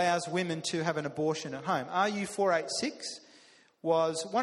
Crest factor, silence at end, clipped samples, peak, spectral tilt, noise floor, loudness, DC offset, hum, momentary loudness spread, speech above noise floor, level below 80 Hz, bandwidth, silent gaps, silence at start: 18 dB; 0 s; under 0.1%; -14 dBFS; -4 dB/octave; -60 dBFS; -31 LUFS; under 0.1%; none; 8 LU; 29 dB; -74 dBFS; 12.5 kHz; none; 0 s